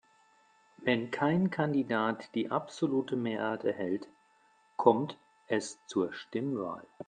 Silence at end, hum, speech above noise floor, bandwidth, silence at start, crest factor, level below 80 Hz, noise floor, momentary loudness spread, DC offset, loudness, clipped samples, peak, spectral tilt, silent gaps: 0.05 s; none; 35 dB; 9.6 kHz; 0.8 s; 24 dB; -76 dBFS; -67 dBFS; 9 LU; under 0.1%; -32 LUFS; under 0.1%; -8 dBFS; -6 dB/octave; none